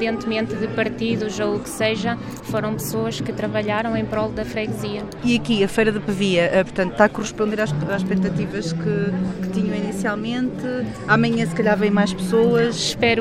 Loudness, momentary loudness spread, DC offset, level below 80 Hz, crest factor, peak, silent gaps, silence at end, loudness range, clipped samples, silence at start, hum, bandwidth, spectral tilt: -21 LUFS; 7 LU; under 0.1%; -46 dBFS; 20 dB; 0 dBFS; none; 0 s; 4 LU; under 0.1%; 0 s; none; 15.5 kHz; -5.5 dB/octave